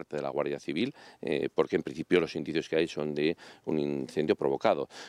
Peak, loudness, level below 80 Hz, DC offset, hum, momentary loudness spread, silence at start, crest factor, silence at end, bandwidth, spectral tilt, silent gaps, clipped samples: -10 dBFS; -31 LUFS; -68 dBFS; under 0.1%; none; 6 LU; 0 s; 20 dB; 0 s; 11.5 kHz; -6 dB/octave; none; under 0.1%